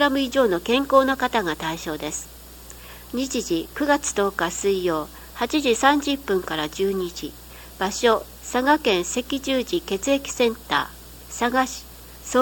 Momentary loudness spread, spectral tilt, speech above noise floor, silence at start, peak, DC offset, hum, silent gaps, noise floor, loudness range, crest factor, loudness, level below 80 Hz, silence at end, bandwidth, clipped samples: 17 LU; -3 dB/octave; 19 dB; 0 s; -2 dBFS; under 0.1%; none; none; -42 dBFS; 3 LU; 20 dB; -23 LUFS; -46 dBFS; 0 s; 18 kHz; under 0.1%